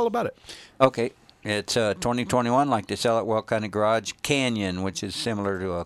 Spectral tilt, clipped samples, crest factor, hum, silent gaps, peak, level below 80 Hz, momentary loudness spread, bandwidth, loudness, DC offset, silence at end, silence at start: -4.5 dB/octave; under 0.1%; 22 dB; none; none; -2 dBFS; -56 dBFS; 8 LU; 15.5 kHz; -25 LUFS; under 0.1%; 0 s; 0 s